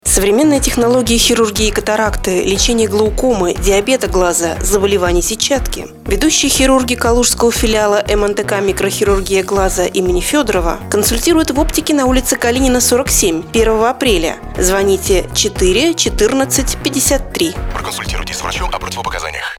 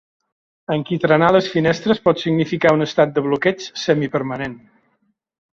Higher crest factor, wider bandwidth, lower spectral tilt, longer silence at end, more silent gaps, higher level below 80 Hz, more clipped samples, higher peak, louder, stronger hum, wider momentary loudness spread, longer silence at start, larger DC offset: about the same, 14 dB vs 18 dB; first, 19 kHz vs 7.6 kHz; second, -3 dB/octave vs -6.5 dB/octave; second, 0 s vs 1 s; neither; first, -24 dBFS vs -56 dBFS; neither; about the same, 0 dBFS vs -2 dBFS; first, -13 LUFS vs -18 LUFS; neither; about the same, 8 LU vs 9 LU; second, 0.05 s vs 0.7 s; neither